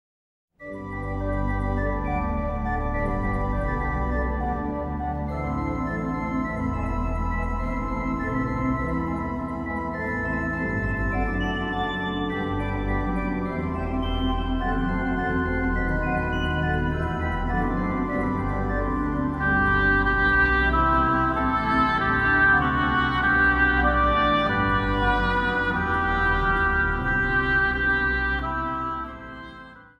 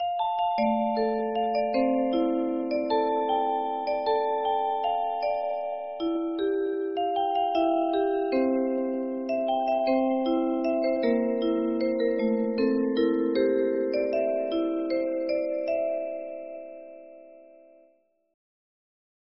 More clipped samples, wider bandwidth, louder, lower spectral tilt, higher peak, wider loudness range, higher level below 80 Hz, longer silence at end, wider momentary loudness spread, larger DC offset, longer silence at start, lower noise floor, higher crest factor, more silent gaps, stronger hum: neither; first, 7 kHz vs 5.8 kHz; first, -24 LUFS vs -27 LUFS; first, -7.5 dB/octave vs -3.5 dB/octave; first, -8 dBFS vs -12 dBFS; about the same, 7 LU vs 6 LU; first, -32 dBFS vs -64 dBFS; second, 0.15 s vs 1.95 s; first, 9 LU vs 5 LU; neither; first, 0.6 s vs 0 s; second, -44 dBFS vs -65 dBFS; about the same, 16 dB vs 14 dB; neither; neither